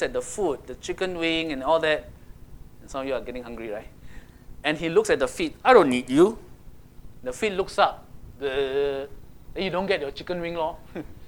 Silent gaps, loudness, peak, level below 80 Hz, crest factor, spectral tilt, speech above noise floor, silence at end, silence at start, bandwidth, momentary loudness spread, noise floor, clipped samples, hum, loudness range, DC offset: none; -25 LUFS; -2 dBFS; -48 dBFS; 24 dB; -4.5 dB/octave; 21 dB; 0 s; 0 s; 20 kHz; 16 LU; -46 dBFS; under 0.1%; none; 6 LU; under 0.1%